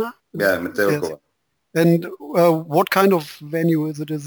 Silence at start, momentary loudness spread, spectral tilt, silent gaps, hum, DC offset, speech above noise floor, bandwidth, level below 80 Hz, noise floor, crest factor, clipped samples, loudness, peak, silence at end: 0 s; 11 LU; -6.5 dB/octave; none; none; under 0.1%; 38 dB; over 20 kHz; -64 dBFS; -57 dBFS; 18 dB; under 0.1%; -19 LUFS; -2 dBFS; 0 s